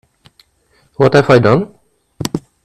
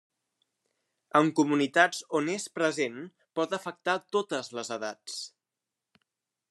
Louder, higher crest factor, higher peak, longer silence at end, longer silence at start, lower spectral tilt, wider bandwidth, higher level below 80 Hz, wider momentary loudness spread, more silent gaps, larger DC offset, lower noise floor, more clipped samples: first, -12 LUFS vs -29 LUFS; second, 14 dB vs 24 dB; first, 0 dBFS vs -6 dBFS; second, 0.25 s vs 1.25 s; second, 1 s vs 1.15 s; first, -6.5 dB/octave vs -4 dB/octave; first, 15 kHz vs 12.5 kHz; first, -46 dBFS vs -86 dBFS; about the same, 15 LU vs 14 LU; neither; neither; second, -56 dBFS vs -88 dBFS; first, 0.2% vs under 0.1%